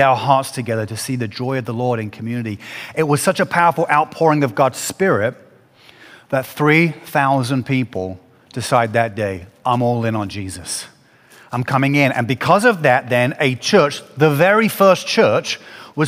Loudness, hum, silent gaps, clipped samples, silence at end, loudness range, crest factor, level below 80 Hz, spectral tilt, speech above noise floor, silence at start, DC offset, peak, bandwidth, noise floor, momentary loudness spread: -17 LUFS; none; none; under 0.1%; 0 s; 6 LU; 18 dB; -58 dBFS; -5 dB/octave; 31 dB; 0 s; under 0.1%; 0 dBFS; 16 kHz; -48 dBFS; 12 LU